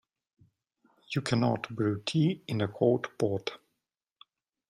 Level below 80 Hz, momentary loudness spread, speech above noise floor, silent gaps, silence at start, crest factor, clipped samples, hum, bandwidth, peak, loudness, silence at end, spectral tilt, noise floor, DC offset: -68 dBFS; 7 LU; 56 dB; none; 1.1 s; 20 dB; under 0.1%; none; 13 kHz; -12 dBFS; -30 LUFS; 1.15 s; -6.5 dB/octave; -85 dBFS; under 0.1%